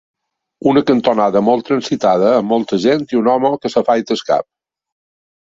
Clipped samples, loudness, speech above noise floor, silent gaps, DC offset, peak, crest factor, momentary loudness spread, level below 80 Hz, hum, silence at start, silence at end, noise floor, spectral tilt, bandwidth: under 0.1%; -15 LUFS; 26 dB; none; under 0.1%; 0 dBFS; 16 dB; 4 LU; -56 dBFS; none; 0.65 s; 1.15 s; -40 dBFS; -6 dB/octave; 7.8 kHz